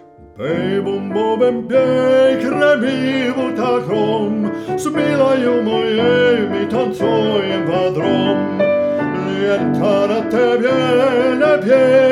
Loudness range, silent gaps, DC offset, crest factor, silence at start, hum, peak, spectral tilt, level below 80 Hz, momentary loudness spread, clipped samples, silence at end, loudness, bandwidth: 1 LU; none; under 0.1%; 14 dB; 0.2 s; none; -2 dBFS; -6.5 dB/octave; -56 dBFS; 6 LU; under 0.1%; 0 s; -15 LUFS; 12 kHz